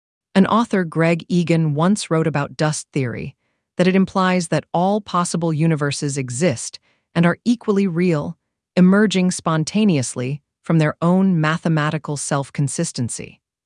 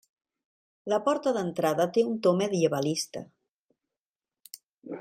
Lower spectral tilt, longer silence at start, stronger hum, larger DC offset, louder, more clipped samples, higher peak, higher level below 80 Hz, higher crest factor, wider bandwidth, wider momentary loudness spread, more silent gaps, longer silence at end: about the same, -6 dB/octave vs -5 dB/octave; second, 0.35 s vs 0.85 s; neither; neither; first, -19 LUFS vs -27 LUFS; neither; first, 0 dBFS vs -10 dBFS; first, -60 dBFS vs -76 dBFS; about the same, 18 dB vs 18 dB; second, 11.5 kHz vs 16 kHz; second, 10 LU vs 21 LU; second, none vs 3.49-3.69 s, 3.98-4.13 s, 4.68-4.73 s; first, 0.4 s vs 0 s